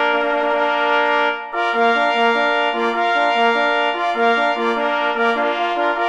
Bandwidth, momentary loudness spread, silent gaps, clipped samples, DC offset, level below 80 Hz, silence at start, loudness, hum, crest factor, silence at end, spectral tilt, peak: 9.6 kHz; 3 LU; none; under 0.1%; under 0.1%; -58 dBFS; 0 s; -17 LUFS; none; 14 dB; 0 s; -3 dB/octave; -4 dBFS